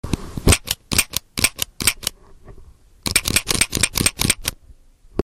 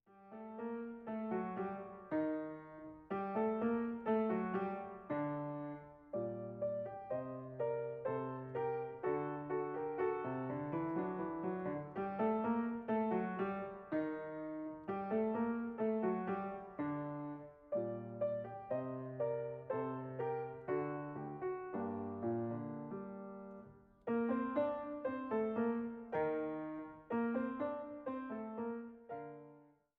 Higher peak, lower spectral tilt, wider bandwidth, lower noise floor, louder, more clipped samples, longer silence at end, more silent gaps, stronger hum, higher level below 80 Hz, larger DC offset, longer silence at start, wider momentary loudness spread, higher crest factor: first, -4 dBFS vs -24 dBFS; second, -2 dB/octave vs -7.5 dB/octave; first, 17 kHz vs 4.3 kHz; second, -47 dBFS vs -64 dBFS; first, -19 LUFS vs -41 LUFS; neither; second, 0 s vs 0.3 s; neither; neither; first, -32 dBFS vs -74 dBFS; neither; about the same, 0.05 s vs 0.1 s; about the same, 11 LU vs 10 LU; about the same, 18 dB vs 16 dB